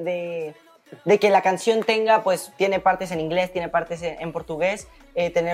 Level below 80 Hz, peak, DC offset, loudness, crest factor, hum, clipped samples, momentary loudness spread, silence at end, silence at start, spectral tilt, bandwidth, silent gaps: -56 dBFS; -6 dBFS; under 0.1%; -22 LUFS; 16 dB; none; under 0.1%; 13 LU; 0 s; 0 s; -4.5 dB/octave; 16 kHz; none